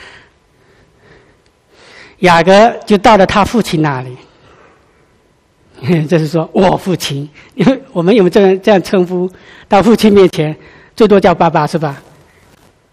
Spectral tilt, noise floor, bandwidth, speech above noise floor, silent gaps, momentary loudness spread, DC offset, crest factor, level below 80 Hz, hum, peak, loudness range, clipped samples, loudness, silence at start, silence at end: -6 dB/octave; -52 dBFS; 15 kHz; 42 dB; none; 13 LU; under 0.1%; 12 dB; -40 dBFS; none; 0 dBFS; 6 LU; 0.6%; -10 LUFS; 0 s; 0.95 s